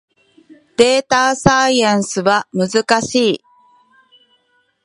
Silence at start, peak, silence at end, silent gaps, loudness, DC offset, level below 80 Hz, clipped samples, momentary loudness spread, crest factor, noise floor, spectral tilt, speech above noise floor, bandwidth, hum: 0.5 s; 0 dBFS; 1.5 s; none; -14 LUFS; under 0.1%; -48 dBFS; under 0.1%; 5 LU; 16 dB; -61 dBFS; -3.5 dB/octave; 47 dB; 11.5 kHz; none